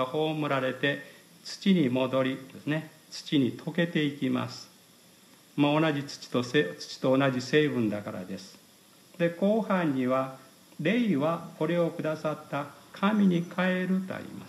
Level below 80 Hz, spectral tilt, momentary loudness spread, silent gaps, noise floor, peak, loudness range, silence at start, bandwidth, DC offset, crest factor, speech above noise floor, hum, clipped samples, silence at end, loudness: -78 dBFS; -6.5 dB/octave; 13 LU; none; -57 dBFS; -12 dBFS; 2 LU; 0 s; 14.5 kHz; under 0.1%; 18 dB; 29 dB; none; under 0.1%; 0 s; -28 LUFS